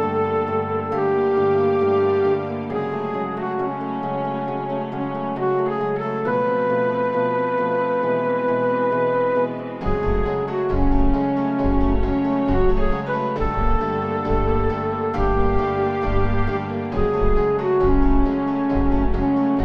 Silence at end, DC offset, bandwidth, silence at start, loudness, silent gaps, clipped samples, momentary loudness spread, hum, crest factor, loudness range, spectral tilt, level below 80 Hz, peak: 0 s; under 0.1%; 5.8 kHz; 0 s; -21 LUFS; none; under 0.1%; 7 LU; none; 14 dB; 3 LU; -9.5 dB/octave; -26 dBFS; -6 dBFS